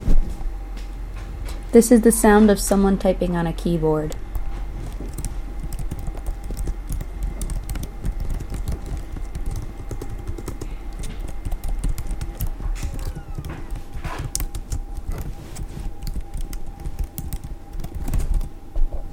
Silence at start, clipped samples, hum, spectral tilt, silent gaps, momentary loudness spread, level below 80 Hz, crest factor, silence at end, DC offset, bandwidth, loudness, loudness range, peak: 0 s; under 0.1%; none; -6 dB/octave; none; 18 LU; -26 dBFS; 22 dB; 0 s; under 0.1%; 16.5 kHz; -24 LUFS; 15 LU; 0 dBFS